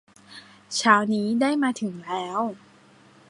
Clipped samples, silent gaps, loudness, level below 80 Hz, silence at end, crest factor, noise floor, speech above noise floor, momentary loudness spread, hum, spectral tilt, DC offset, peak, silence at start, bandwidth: under 0.1%; none; -24 LUFS; -72 dBFS; 0.75 s; 22 dB; -54 dBFS; 31 dB; 22 LU; none; -4 dB/octave; under 0.1%; -2 dBFS; 0.3 s; 11.5 kHz